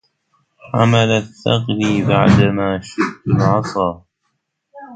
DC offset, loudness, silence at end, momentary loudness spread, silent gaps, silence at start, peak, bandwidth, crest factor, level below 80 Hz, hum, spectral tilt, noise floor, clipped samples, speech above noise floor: under 0.1%; -16 LUFS; 0 s; 9 LU; none; 0.65 s; 0 dBFS; 9 kHz; 16 dB; -42 dBFS; none; -6.5 dB/octave; -71 dBFS; under 0.1%; 56 dB